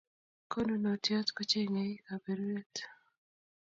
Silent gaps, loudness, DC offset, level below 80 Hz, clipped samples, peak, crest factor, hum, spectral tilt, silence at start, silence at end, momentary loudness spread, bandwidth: 2.66-2.70 s; -35 LUFS; under 0.1%; -70 dBFS; under 0.1%; -18 dBFS; 20 dB; none; -4 dB/octave; 0.5 s; 0.7 s; 11 LU; 7.4 kHz